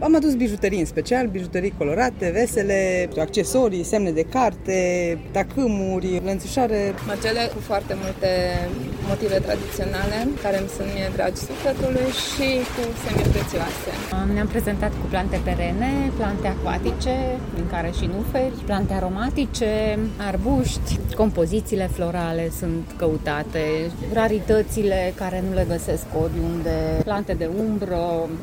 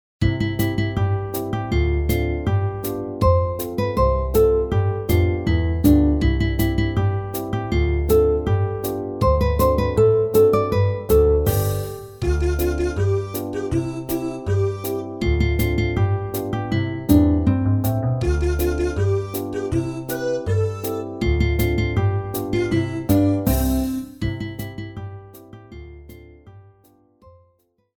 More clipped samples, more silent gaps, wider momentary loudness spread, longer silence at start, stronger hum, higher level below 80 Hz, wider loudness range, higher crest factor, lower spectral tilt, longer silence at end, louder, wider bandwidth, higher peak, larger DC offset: neither; neither; second, 5 LU vs 10 LU; second, 0 s vs 0.2 s; neither; about the same, -32 dBFS vs -28 dBFS; about the same, 3 LU vs 5 LU; about the same, 16 dB vs 18 dB; second, -5.5 dB/octave vs -7.5 dB/octave; second, 0 s vs 1.35 s; about the same, -23 LUFS vs -21 LUFS; second, 17 kHz vs 19.5 kHz; second, -6 dBFS vs -2 dBFS; neither